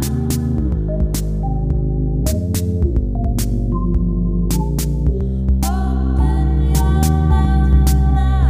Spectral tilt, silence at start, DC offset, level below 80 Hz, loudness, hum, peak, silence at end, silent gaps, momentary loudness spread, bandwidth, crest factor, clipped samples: -7 dB/octave; 0 s; under 0.1%; -18 dBFS; -18 LUFS; none; -2 dBFS; 0 s; none; 5 LU; 16 kHz; 14 dB; under 0.1%